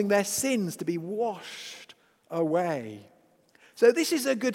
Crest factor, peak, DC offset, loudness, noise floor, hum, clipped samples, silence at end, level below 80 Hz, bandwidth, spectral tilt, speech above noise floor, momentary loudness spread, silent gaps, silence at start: 20 dB; -8 dBFS; under 0.1%; -27 LUFS; -62 dBFS; none; under 0.1%; 0 s; -74 dBFS; 16.5 kHz; -4 dB/octave; 35 dB; 18 LU; none; 0 s